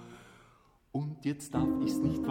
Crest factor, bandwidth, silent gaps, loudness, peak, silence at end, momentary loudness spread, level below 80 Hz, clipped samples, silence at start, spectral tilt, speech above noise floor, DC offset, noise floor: 16 dB; 16.5 kHz; none; -33 LUFS; -18 dBFS; 0 s; 16 LU; -54 dBFS; under 0.1%; 0 s; -7 dB/octave; 32 dB; under 0.1%; -63 dBFS